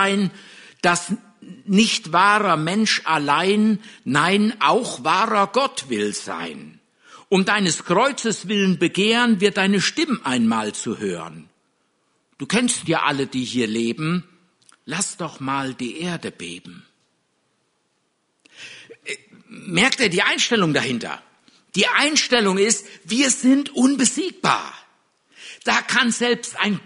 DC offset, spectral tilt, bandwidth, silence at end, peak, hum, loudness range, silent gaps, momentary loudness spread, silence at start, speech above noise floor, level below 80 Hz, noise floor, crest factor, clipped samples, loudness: under 0.1%; -3.5 dB/octave; 11 kHz; 0.05 s; -2 dBFS; none; 10 LU; none; 15 LU; 0 s; 49 dB; -64 dBFS; -69 dBFS; 20 dB; under 0.1%; -19 LUFS